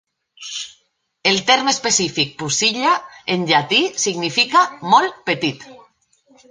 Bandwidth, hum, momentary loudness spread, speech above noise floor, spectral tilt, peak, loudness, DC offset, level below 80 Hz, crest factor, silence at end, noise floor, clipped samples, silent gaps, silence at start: 10 kHz; none; 14 LU; 46 dB; -2 dB/octave; -2 dBFS; -17 LUFS; under 0.1%; -62 dBFS; 18 dB; 0.75 s; -64 dBFS; under 0.1%; none; 0.4 s